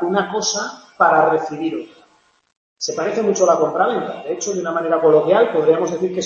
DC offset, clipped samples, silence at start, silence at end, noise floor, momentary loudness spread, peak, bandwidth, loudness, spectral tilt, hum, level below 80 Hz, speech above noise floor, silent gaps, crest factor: under 0.1%; under 0.1%; 0 s; 0 s; -56 dBFS; 11 LU; -2 dBFS; 7.4 kHz; -18 LUFS; -4 dB/octave; none; -66 dBFS; 39 dB; 2.57-2.76 s; 16 dB